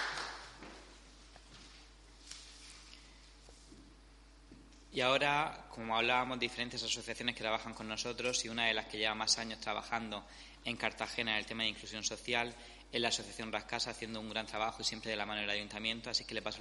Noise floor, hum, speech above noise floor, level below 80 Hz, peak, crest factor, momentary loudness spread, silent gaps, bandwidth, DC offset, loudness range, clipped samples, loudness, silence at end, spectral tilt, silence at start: -59 dBFS; none; 22 dB; -60 dBFS; -16 dBFS; 24 dB; 21 LU; none; 11.5 kHz; under 0.1%; 19 LU; under 0.1%; -36 LUFS; 0 s; -2 dB/octave; 0 s